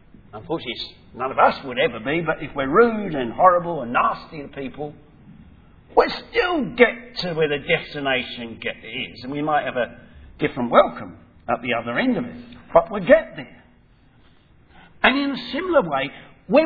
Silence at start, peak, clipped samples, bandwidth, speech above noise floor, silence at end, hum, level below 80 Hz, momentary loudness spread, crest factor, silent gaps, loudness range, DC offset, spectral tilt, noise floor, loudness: 0.35 s; 0 dBFS; under 0.1%; 5 kHz; 33 dB; 0 s; none; -50 dBFS; 16 LU; 22 dB; none; 4 LU; under 0.1%; -7 dB/octave; -54 dBFS; -21 LUFS